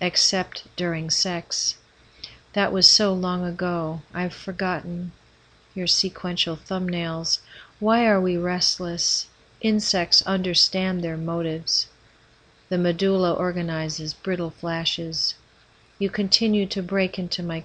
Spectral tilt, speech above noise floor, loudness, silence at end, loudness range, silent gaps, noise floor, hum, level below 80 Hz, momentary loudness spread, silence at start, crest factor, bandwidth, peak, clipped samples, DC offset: -3.5 dB/octave; 33 dB; -22 LUFS; 0 s; 5 LU; none; -56 dBFS; none; -54 dBFS; 11 LU; 0 s; 24 dB; 9.8 kHz; 0 dBFS; under 0.1%; under 0.1%